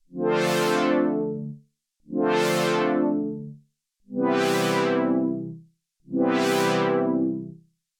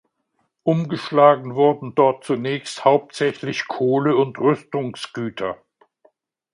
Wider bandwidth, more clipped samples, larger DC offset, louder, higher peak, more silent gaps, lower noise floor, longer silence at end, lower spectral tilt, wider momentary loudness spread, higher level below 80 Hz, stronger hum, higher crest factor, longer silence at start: first, over 20 kHz vs 11 kHz; neither; neither; second, -24 LUFS vs -20 LUFS; second, -10 dBFS vs 0 dBFS; neither; second, -62 dBFS vs -71 dBFS; second, 0.45 s vs 1 s; second, -5 dB/octave vs -6.5 dB/octave; about the same, 13 LU vs 13 LU; second, -76 dBFS vs -66 dBFS; neither; about the same, 16 dB vs 20 dB; second, 0.1 s vs 0.65 s